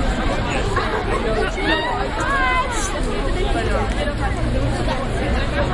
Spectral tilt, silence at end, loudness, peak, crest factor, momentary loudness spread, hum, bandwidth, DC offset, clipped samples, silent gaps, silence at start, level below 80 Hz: -5 dB/octave; 0 s; -21 LUFS; -4 dBFS; 16 dB; 4 LU; none; 11.5 kHz; under 0.1%; under 0.1%; none; 0 s; -24 dBFS